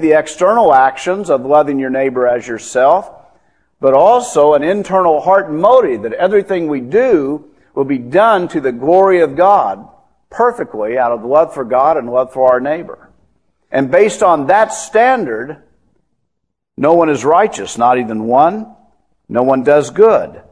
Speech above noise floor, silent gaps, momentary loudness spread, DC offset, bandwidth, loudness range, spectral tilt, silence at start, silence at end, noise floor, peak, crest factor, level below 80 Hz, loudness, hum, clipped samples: 61 dB; none; 9 LU; 0.1%; 11 kHz; 3 LU; -5.5 dB/octave; 0 s; 0.2 s; -73 dBFS; 0 dBFS; 12 dB; -52 dBFS; -12 LUFS; none; 0.2%